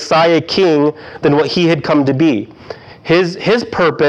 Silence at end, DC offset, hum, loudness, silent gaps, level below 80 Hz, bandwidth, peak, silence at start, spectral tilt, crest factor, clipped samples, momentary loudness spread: 0 s; under 0.1%; none; -13 LUFS; none; -50 dBFS; 9 kHz; -2 dBFS; 0 s; -6 dB/octave; 12 dB; under 0.1%; 13 LU